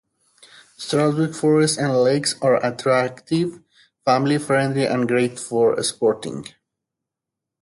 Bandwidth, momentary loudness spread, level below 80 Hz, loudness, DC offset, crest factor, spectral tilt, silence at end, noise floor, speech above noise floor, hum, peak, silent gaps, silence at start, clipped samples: 11.5 kHz; 9 LU; -64 dBFS; -20 LUFS; under 0.1%; 16 dB; -5 dB/octave; 1.15 s; -85 dBFS; 65 dB; none; -4 dBFS; none; 0.8 s; under 0.1%